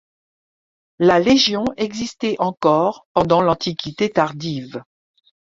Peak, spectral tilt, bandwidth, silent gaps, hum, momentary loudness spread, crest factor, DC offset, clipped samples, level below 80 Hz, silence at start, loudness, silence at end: 0 dBFS; -5 dB/octave; 7.8 kHz; 3.05-3.15 s; none; 12 LU; 18 dB; under 0.1%; under 0.1%; -52 dBFS; 1 s; -18 LUFS; 0.75 s